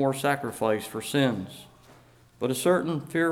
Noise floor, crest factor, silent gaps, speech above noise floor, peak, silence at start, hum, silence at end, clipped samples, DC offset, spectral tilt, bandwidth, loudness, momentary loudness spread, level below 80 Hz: -55 dBFS; 18 dB; none; 29 dB; -10 dBFS; 0 s; none; 0 s; under 0.1%; under 0.1%; -5 dB/octave; 18.5 kHz; -27 LUFS; 10 LU; -64 dBFS